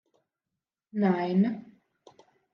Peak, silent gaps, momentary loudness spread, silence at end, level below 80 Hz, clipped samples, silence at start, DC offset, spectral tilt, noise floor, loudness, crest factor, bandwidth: -12 dBFS; none; 13 LU; 0.9 s; -82 dBFS; under 0.1%; 0.95 s; under 0.1%; -9.5 dB/octave; -88 dBFS; -27 LUFS; 18 dB; 5.6 kHz